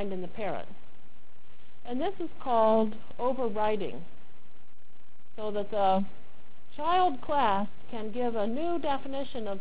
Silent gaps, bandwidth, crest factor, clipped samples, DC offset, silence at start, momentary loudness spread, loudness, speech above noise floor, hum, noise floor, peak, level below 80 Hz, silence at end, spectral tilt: none; 4 kHz; 18 dB; under 0.1%; 4%; 0 s; 13 LU; -30 LUFS; 33 dB; none; -63 dBFS; -14 dBFS; -60 dBFS; 0 s; -9 dB/octave